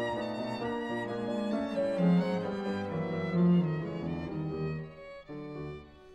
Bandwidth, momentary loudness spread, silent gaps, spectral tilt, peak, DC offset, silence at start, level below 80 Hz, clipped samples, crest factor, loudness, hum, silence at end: 8.2 kHz; 16 LU; none; -8.5 dB/octave; -16 dBFS; under 0.1%; 0 s; -60 dBFS; under 0.1%; 16 dB; -32 LUFS; none; 0 s